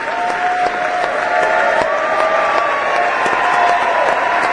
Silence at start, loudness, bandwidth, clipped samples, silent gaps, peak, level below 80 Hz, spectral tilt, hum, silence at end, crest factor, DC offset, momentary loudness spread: 0 s; -15 LUFS; 10.5 kHz; under 0.1%; none; 0 dBFS; -52 dBFS; -2.5 dB/octave; none; 0 s; 16 dB; under 0.1%; 4 LU